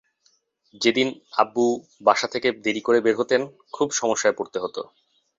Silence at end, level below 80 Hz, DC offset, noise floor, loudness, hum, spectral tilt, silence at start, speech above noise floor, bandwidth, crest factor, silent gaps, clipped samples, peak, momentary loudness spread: 0.55 s; -68 dBFS; under 0.1%; -66 dBFS; -23 LUFS; none; -3 dB/octave; 0.8 s; 43 dB; 7.8 kHz; 22 dB; none; under 0.1%; -2 dBFS; 9 LU